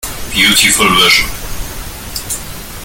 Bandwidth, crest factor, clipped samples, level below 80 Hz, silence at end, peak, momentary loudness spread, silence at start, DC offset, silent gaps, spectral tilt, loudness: over 20 kHz; 14 dB; under 0.1%; -28 dBFS; 0 s; 0 dBFS; 18 LU; 0 s; under 0.1%; none; -1 dB/octave; -9 LUFS